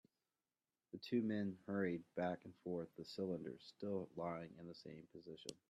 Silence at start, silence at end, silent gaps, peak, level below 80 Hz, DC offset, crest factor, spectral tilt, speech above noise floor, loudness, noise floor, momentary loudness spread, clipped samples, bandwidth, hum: 0.95 s; 0.15 s; none; -28 dBFS; -84 dBFS; under 0.1%; 18 dB; -6.5 dB/octave; over 44 dB; -46 LUFS; under -90 dBFS; 14 LU; under 0.1%; 13 kHz; none